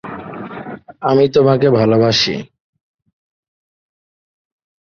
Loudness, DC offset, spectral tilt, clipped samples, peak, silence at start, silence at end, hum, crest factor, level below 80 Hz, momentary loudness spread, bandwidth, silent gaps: -13 LUFS; under 0.1%; -6 dB/octave; under 0.1%; -2 dBFS; 0.05 s; 2.4 s; none; 16 dB; -52 dBFS; 17 LU; 6.8 kHz; none